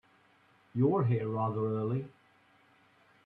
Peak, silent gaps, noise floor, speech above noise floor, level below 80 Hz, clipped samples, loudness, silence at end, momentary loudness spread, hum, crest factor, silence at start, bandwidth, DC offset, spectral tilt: -16 dBFS; none; -66 dBFS; 35 dB; -74 dBFS; under 0.1%; -32 LUFS; 1.15 s; 11 LU; none; 18 dB; 0.75 s; 4 kHz; under 0.1%; -11.5 dB/octave